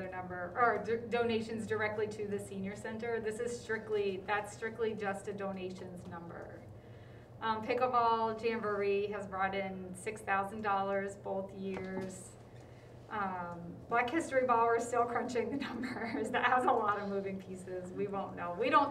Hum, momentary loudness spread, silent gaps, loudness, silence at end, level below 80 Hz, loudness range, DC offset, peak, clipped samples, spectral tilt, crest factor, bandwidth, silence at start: none; 16 LU; none; -35 LUFS; 0 s; -66 dBFS; 6 LU; under 0.1%; -14 dBFS; under 0.1%; -5 dB/octave; 20 dB; 13.5 kHz; 0 s